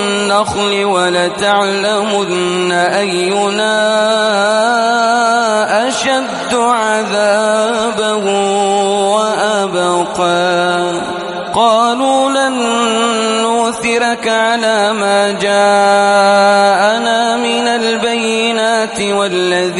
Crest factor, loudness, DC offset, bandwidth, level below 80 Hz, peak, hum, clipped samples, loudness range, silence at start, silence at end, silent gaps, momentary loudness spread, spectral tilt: 12 dB; -12 LUFS; under 0.1%; 11.5 kHz; -52 dBFS; 0 dBFS; none; under 0.1%; 2 LU; 0 s; 0 s; none; 5 LU; -3 dB/octave